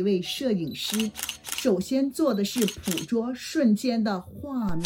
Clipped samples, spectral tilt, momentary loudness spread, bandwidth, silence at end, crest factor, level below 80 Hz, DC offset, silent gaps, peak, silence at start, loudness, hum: under 0.1%; -4.5 dB/octave; 7 LU; 17.5 kHz; 0 s; 16 dB; -52 dBFS; under 0.1%; none; -10 dBFS; 0 s; -27 LUFS; none